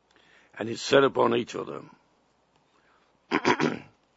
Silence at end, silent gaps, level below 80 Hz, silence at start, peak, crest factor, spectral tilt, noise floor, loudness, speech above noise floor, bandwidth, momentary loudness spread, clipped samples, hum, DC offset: 0.35 s; none; -70 dBFS; 0.55 s; -6 dBFS; 22 dB; -4.5 dB/octave; -67 dBFS; -26 LUFS; 42 dB; 8 kHz; 17 LU; under 0.1%; none; under 0.1%